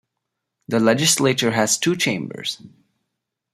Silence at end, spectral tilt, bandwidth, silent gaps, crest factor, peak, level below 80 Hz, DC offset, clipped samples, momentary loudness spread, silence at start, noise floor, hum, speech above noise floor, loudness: 0.85 s; -3 dB/octave; 15.5 kHz; none; 20 dB; -2 dBFS; -62 dBFS; under 0.1%; under 0.1%; 12 LU; 0.7 s; -80 dBFS; none; 60 dB; -19 LUFS